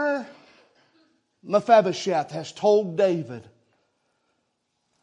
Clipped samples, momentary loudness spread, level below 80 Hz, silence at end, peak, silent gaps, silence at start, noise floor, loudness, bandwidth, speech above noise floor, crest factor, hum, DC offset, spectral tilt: under 0.1%; 18 LU; -78 dBFS; 1.65 s; -4 dBFS; none; 0 s; -75 dBFS; -22 LUFS; 10 kHz; 53 dB; 22 dB; none; under 0.1%; -5.5 dB/octave